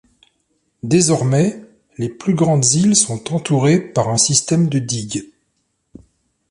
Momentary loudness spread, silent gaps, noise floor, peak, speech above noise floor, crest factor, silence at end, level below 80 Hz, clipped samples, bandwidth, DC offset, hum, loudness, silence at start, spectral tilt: 13 LU; none; -68 dBFS; 0 dBFS; 53 dB; 18 dB; 1.25 s; -54 dBFS; under 0.1%; 11.5 kHz; under 0.1%; none; -16 LUFS; 0.85 s; -4.5 dB/octave